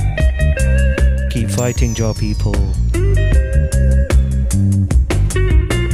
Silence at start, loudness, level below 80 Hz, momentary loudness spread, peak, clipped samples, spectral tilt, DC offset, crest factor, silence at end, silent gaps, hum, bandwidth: 0 s; -16 LUFS; -16 dBFS; 3 LU; -2 dBFS; under 0.1%; -6 dB/octave; under 0.1%; 10 dB; 0 s; none; none; 12.5 kHz